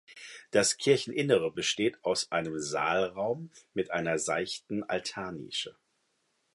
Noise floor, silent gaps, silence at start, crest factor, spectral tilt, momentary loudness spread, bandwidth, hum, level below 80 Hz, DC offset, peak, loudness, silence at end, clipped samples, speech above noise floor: -76 dBFS; none; 0.1 s; 22 dB; -3 dB/octave; 11 LU; 11.5 kHz; none; -68 dBFS; under 0.1%; -10 dBFS; -30 LUFS; 0.85 s; under 0.1%; 45 dB